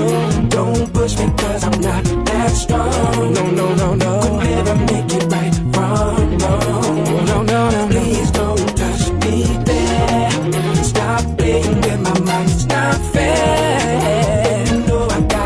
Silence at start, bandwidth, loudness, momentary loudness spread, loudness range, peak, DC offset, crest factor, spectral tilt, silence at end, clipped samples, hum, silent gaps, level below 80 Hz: 0 s; 11 kHz; -16 LUFS; 2 LU; 1 LU; 0 dBFS; under 0.1%; 14 dB; -5.5 dB/octave; 0 s; under 0.1%; none; none; -24 dBFS